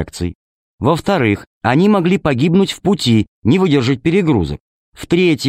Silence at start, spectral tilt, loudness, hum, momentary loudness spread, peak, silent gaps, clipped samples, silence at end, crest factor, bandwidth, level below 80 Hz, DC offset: 0 s; -6.5 dB/octave; -15 LUFS; none; 11 LU; -2 dBFS; 0.35-0.78 s, 1.47-1.61 s, 3.28-3.42 s, 4.60-4.92 s; under 0.1%; 0 s; 14 dB; 15 kHz; -40 dBFS; under 0.1%